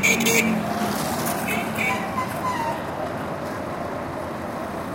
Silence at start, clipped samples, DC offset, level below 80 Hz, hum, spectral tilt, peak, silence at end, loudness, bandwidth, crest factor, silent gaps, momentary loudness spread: 0 s; under 0.1%; under 0.1%; -50 dBFS; none; -3.5 dB/octave; -4 dBFS; 0 s; -24 LUFS; 17 kHz; 20 dB; none; 11 LU